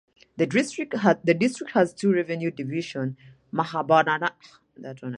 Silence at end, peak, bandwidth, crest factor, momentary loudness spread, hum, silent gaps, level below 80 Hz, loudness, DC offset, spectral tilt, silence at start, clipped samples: 0 s; -4 dBFS; 11 kHz; 22 dB; 12 LU; none; none; -70 dBFS; -24 LUFS; under 0.1%; -6 dB/octave; 0.35 s; under 0.1%